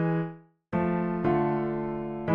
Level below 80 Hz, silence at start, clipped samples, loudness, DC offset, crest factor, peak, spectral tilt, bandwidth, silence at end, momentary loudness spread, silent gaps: -52 dBFS; 0 s; under 0.1%; -29 LUFS; under 0.1%; 16 dB; -12 dBFS; -11 dB/octave; 5 kHz; 0 s; 7 LU; none